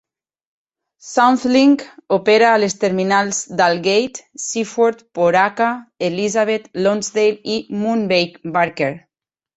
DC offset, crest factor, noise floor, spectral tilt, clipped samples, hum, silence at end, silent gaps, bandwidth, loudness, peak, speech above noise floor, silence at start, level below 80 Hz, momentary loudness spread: under 0.1%; 16 dB; -85 dBFS; -4 dB/octave; under 0.1%; none; 0.6 s; none; 8.2 kHz; -17 LUFS; -2 dBFS; 68 dB; 1.05 s; -62 dBFS; 9 LU